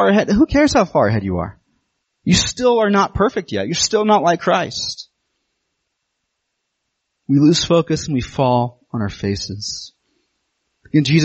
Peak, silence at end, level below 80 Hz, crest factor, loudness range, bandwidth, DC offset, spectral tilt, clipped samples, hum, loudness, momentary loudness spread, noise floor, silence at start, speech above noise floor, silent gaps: -2 dBFS; 0 s; -40 dBFS; 16 dB; 5 LU; 8.4 kHz; under 0.1%; -5 dB/octave; under 0.1%; none; -17 LUFS; 12 LU; -74 dBFS; 0 s; 59 dB; none